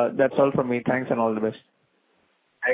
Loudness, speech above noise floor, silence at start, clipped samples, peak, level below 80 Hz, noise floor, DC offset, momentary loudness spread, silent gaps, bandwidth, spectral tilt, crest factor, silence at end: -24 LUFS; 44 dB; 0 s; under 0.1%; -6 dBFS; -64 dBFS; -67 dBFS; under 0.1%; 8 LU; none; 4 kHz; -10.5 dB/octave; 18 dB; 0 s